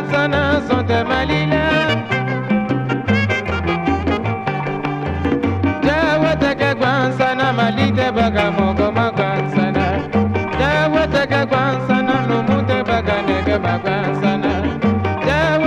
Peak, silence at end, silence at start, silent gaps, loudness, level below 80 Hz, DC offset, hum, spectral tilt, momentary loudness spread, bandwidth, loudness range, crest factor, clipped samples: -2 dBFS; 0 s; 0 s; none; -17 LUFS; -34 dBFS; under 0.1%; none; -7 dB/octave; 4 LU; 9.8 kHz; 2 LU; 14 dB; under 0.1%